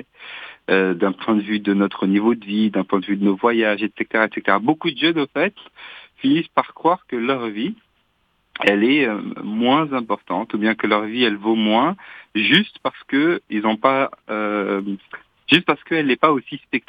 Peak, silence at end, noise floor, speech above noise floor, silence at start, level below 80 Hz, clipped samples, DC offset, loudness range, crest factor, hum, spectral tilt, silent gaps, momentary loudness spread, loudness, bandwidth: 0 dBFS; 0.1 s; -65 dBFS; 46 dB; 0.2 s; -66 dBFS; under 0.1%; under 0.1%; 2 LU; 20 dB; none; -7 dB/octave; none; 12 LU; -19 LUFS; 8.2 kHz